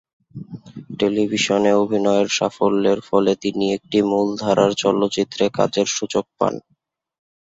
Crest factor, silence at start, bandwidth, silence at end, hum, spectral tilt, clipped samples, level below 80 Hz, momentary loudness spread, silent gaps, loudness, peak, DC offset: 16 dB; 0.35 s; 7.8 kHz; 0.9 s; none; -4.5 dB/octave; under 0.1%; -58 dBFS; 13 LU; none; -19 LUFS; -2 dBFS; under 0.1%